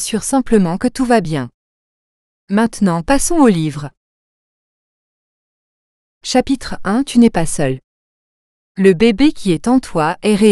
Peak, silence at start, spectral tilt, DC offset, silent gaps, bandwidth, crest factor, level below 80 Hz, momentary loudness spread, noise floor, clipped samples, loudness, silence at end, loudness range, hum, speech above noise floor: 0 dBFS; 0 s; -5.5 dB/octave; under 0.1%; 1.54-2.47 s, 3.97-6.21 s, 7.84-8.75 s; 13.5 kHz; 16 dB; -36 dBFS; 11 LU; under -90 dBFS; under 0.1%; -15 LUFS; 0 s; 6 LU; none; over 76 dB